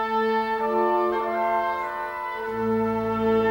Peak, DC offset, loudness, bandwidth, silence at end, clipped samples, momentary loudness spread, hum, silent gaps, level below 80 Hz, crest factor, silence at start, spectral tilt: -12 dBFS; under 0.1%; -25 LUFS; 16.5 kHz; 0 s; under 0.1%; 7 LU; none; none; -54 dBFS; 12 dB; 0 s; -7 dB/octave